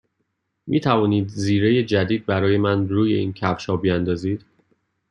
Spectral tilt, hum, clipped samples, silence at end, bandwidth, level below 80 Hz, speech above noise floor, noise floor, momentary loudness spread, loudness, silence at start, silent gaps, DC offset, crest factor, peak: -7 dB/octave; none; under 0.1%; 0.75 s; 10.5 kHz; -56 dBFS; 54 dB; -74 dBFS; 6 LU; -21 LUFS; 0.65 s; none; under 0.1%; 18 dB; -4 dBFS